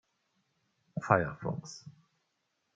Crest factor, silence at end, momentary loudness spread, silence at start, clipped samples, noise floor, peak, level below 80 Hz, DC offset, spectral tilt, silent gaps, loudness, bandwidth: 30 dB; 0.85 s; 19 LU; 0.95 s; under 0.1%; -80 dBFS; -6 dBFS; -66 dBFS; under 0.1%; -6.5 dB/octave; none; -32 LUFS; 9 kHz